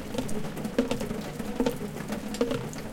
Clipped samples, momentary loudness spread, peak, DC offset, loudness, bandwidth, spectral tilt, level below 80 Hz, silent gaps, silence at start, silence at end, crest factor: under 0.1%; 5 LU; -10 dBFS; under 0.1%; -32 LUFS; 17 kHz; -5.5 dB/octave; -46 dBFS; none; 0 s; 0 s; 20 dB